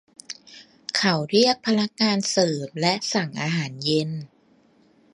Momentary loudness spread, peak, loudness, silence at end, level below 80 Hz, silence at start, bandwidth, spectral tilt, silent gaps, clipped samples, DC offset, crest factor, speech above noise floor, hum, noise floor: 18 LU; -4 dBFS; -22 LUFS; 0.9 s; -68 dBFS; 0.3 s; 11.5 kHz; -4 dB/octave; none; under 0.1%; under 0.1%; 20 dB; 36 dB; none; -59 dBFS